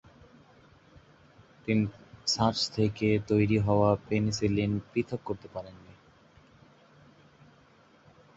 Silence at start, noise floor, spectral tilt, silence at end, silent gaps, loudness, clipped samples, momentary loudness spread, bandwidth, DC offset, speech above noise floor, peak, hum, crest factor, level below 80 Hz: 1.65 s; -60 dBFS; -6 dB/octave; 2.45 s; none; -28 LUFS; under 0.1%; 13 LU; 8 kHz; under 0.1%; 32 dB; -10 dBFS; none; 20 dB; -54 dBFS